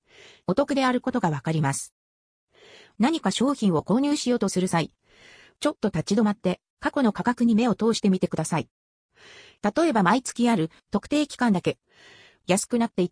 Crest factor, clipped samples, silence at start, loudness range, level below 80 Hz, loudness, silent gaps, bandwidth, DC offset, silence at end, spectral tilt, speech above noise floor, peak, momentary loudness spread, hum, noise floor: 20 dB; under 0.1%; 0.5 s; 2 LU; -60 dBFS; -24 LUFS; 1.92-2.48 s, 6.70-6.77 s, 8.71-9.09 s; 10.5 kHz; under 0.1%; 0.05 s; -5.5 dB/octave; 29 dB; -6 dBFS; 8 LU; none; -53 dBFS